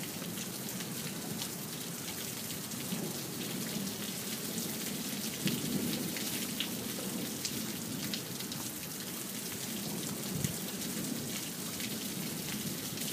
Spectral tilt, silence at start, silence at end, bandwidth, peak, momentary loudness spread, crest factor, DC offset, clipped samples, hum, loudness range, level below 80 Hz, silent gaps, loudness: -3 dB/octave; 0 s; 0 s; 15.5 kHz; -14 dBFS; 4 LU; 24 dB; under 0.1%; under 0.1%; none; 2 LU; -68 dBFS; none; -37 LUFS